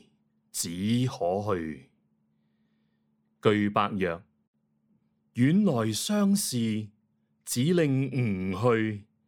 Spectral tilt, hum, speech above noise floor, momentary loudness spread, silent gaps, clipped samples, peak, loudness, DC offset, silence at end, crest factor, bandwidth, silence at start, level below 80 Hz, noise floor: -5.5 dB/octave; none; 46 dB; 12 LU; 4.47-4.54 s; under 0.1%; -8 dBFS; -27 LUFS; under 0.1%; 0.25 s; 22 dB; 18 kHz; 0.55 s; -66 dBFS; -72 dBFS